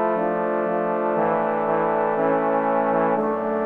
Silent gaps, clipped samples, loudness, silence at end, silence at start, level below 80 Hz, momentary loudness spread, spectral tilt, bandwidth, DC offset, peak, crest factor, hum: none; under 0.1%; -22 LUFS; 0 s; 0 s; -68 dBFS; 2 LU; -9.5 dB/octave; 4.4 kHz; under 0.1%; -6 dBFS; 14 dB; none